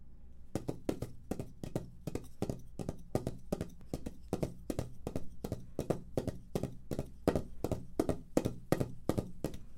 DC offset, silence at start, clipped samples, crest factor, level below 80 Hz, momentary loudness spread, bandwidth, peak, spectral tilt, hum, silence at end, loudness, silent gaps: under 0.1%; 0 s; under 0.1%; 26 dB; -52 dBFS; 9 LU; 16.5 kHz; -12 dBFS; -7 dB/octave; none; 0 s; -40 LUFS; none